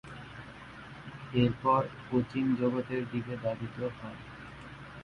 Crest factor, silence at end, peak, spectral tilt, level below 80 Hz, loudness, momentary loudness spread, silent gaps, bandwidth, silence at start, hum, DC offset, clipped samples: 20 dB; 0 s; -14 dBFS; -8.5 dB/octave; -58 dBFS; -32 LUFS; 18 LU; none; 9.8 kHz; 0.05 s; none; under 0.1%; under 0.1%